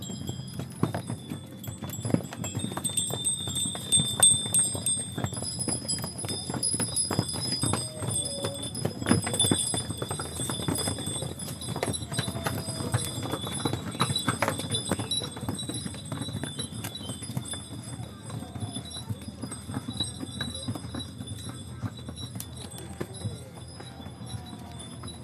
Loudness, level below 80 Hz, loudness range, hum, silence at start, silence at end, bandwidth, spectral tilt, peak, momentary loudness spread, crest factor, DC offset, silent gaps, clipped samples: -29 LUFS; -50 dBFS; 12 LU; none; 0 s; 0 s; 15 kHz; -3 dB/octave; -4 dBFS; 15 LU; 26 dB; under 0.1%; none; under 0.1%